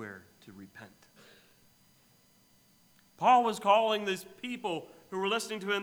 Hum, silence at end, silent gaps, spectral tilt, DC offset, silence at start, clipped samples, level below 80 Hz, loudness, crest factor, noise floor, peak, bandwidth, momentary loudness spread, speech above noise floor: none; 0 s; none; -3.5 dB/octave; under 0.1%; 0 s; under 0.1%; -82 dBFS; -29 LUFS; 20 dB; -65 dBFS; -12 dBFS; over 20 kHz; 26 LU; 35 dB